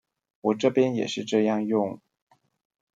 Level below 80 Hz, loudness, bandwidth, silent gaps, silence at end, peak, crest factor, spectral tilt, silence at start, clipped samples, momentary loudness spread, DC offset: -76 dBFS; -25 LUFS; 7.8 kHz; none; 1 s; -8 dBFS; 18 dB; -6 dB/octave; 0.45 s; under 0.1%; 8 LU; under 0.1%